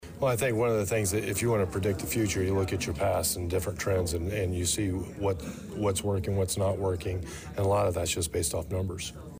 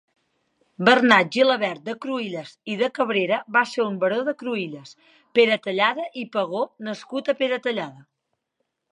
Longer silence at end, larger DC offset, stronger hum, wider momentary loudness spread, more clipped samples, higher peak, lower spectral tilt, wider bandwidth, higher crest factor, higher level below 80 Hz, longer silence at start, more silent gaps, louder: second, 0 s vs 0.9 s; neither; neither; second, 6 LU vs 14 LU; neither; second, -18 dBFS vs 0 dBFS; about the same, -5 dB/octave vs -5 dB/octave; first, 16 kHz vs 10.5 kHz; second, 12 dB vs 22 dB; first, -46 dBFS vs -76 dBFS; second, 0 s vs 0.8 s; neither; second, -29 LUFS vs -22 LUFS